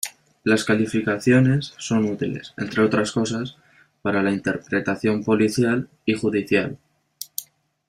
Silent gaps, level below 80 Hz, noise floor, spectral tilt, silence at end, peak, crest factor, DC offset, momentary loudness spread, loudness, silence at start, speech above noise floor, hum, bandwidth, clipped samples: none; -58 dBFS; -42 dBFS; -5.5 dB/octave; 0.45 s; -4 dBFS; 18 dB; under 0.1%; 13 LU; -22 LUFS; 0.05 s; 21 dB; none; 15.5 kHz; under 0.1%